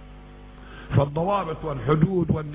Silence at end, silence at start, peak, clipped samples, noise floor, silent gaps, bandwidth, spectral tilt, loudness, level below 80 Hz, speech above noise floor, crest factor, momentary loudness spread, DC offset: 0 s; 0 s; -6 dBFS; under 0.1%; -43 dBFS; none; 3.9 kHz; -12 dB/octave; -24 LUFS; -42 dBFS; 20 dB; 18 dB; 12 LU; under 0.1%